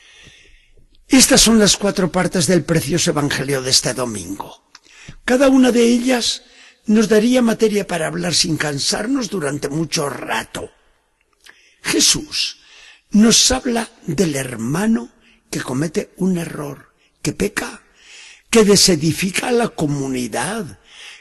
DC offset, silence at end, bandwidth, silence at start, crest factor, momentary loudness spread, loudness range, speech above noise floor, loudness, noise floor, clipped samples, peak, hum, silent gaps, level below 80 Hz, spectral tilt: under 0.1%; 0.05 s; 13 kHz; 1.1 s; 18 dB; 16 LU; 7 LU; 45 dB; -16 LUFS; -62 dBFS; under 0.1%; 0 dBFS; none; none; -42 dBFS; -3.5 dB/octave